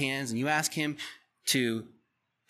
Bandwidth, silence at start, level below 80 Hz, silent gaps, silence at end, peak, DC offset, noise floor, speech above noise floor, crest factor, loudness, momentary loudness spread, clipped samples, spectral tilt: 15.5 kHz; 0 s; -80 dBFS; none; 0.65 s; -14 dBFS; under 0.1%; -77 dBFS; 46 dB; 20 dB; -30 LUFS; 11 LU; under 0.1%; -3 dB/octave